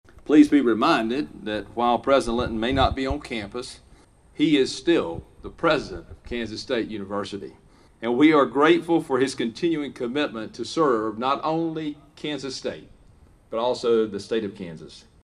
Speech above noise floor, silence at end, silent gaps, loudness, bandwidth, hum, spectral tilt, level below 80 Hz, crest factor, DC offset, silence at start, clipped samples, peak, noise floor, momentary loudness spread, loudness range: 30 dB; 0.25 s; none; -23 LUFS; 11.5 kHz; none; -5.5 dB/octave; -46 dBFS; 20 dB; under 0.1%; 0.25 s; under 0.1%; -4 dBFS; -53 dBFS; 16 LU; 6 LU